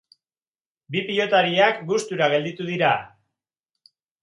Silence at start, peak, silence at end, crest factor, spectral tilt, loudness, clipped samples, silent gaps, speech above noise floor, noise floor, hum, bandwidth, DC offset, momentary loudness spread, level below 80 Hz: 0.9 s; -4 dBFS; 1.15 s; 20 dB; -4.5 dB/octave; -21 LUFS; under 0.1%; none; over 69 dB; under -90 dBFS; none; 11.5 kHz; under 0.1%; 9 LU; -70 dBFS